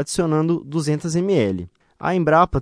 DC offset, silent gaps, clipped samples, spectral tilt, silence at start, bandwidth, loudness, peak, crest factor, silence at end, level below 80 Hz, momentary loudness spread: under 0.1%; none; under 0.1%; -6 dB/octave; 0 s; 11 kHz; -20 LUFS; -2 dBFS; 16 dB; 0 s; -42 dBFS; 11 LU